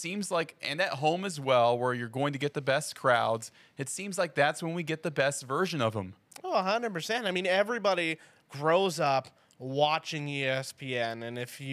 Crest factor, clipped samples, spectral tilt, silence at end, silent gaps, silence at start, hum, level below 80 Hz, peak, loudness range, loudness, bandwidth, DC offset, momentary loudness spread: 20 dB; under 0.1%; -4 dB/octave; 0 s; none; 0 s; none; -82 dBFS; -10 dBFS; 2 LU; -30 LUFS; 15.5 kHz; under 0.1%; 10 LU